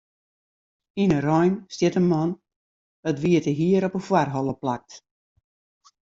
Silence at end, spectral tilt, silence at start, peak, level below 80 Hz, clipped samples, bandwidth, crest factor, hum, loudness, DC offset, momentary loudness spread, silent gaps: 1.05 s; -7 dB/octave; 0.95 s; -6 dBFS; -60 dBFS; under 0.1%; 7.6 kHz; 18 dB; none; -23 LUFS; under 0.1%; 10 LU; 2.56-3.03 s